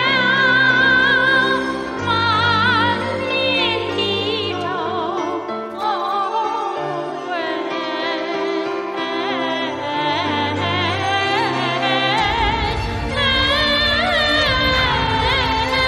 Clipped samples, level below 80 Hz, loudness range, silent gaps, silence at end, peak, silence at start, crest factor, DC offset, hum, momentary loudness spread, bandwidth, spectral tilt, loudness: under 0.1%; -36 dBFS; 7 LU; none; 0 s; -4 dBFS; 0 s; 16 dB; under 0.1%; none; 9 LU; 14 kHz; -4.5 dB/octave; -18 LUFS